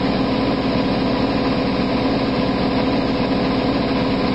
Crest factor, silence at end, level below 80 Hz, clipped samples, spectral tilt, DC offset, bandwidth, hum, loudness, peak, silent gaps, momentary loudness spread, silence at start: 12 dB; 0 s; -34 dBFS; under 0.1%; -7.5 dB/octave; 0.7%; 8 kHz; none; -19 LUFS; -8 dBFS; none; 0 LU; 0 s